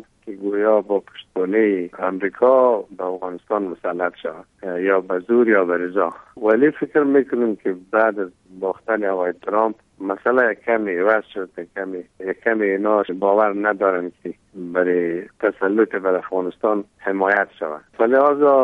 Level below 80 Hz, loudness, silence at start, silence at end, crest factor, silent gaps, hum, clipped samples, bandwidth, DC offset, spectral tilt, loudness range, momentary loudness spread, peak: -66 dBFS; -20 LUFS; 0.25 s; 0 s; 18 dB; none; none; under 0.1%; 4.1 kHz; under 0.1%; -8 dB/octave; 3 LU; 14 LU; -2 dBFS